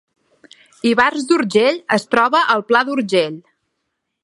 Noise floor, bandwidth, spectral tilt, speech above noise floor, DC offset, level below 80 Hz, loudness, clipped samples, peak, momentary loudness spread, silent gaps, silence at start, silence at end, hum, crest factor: -74 dBFS; 11.5 kHz; -4.5 dB/octave; 59 dB; under 0.1%; -64 dBFS; -16 LUFS; under 0.1%; 0 dBFS; 6 LU; none; 0.85 s; 0.85 s; none; 18 dB